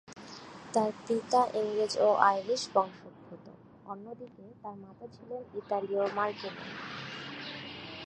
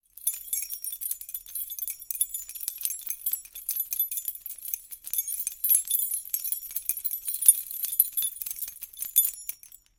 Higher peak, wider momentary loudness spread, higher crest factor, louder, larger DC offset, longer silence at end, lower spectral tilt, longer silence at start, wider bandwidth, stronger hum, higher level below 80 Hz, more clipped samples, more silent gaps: second, -6 dBFS vs -2 dBFS; first, 22 LU vs 13 LU; about the same, 26 dB vs 28 dB; second, -31 LUFS vs -27 LUFS; neither; second, 0 s vs 0.3 s; first, -4 dB/octave vs 4 dB/octave; about the same, 0.1 s vs 0.2 s; second, 11 kHz vs 17 kHz; neither; about the same, -72 dBFS vs -68 dBFS; neither; neither